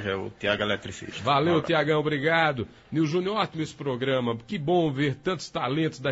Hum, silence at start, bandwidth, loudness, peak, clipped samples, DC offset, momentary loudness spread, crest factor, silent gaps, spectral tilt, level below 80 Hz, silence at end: none; 0 s; 8 kHz; -26 LUFS; -8 dBFS; under 0.1%; under 0.1%; 8 LU; 18 dB; none; -6 dB/octave; -58 dBFS; 0 s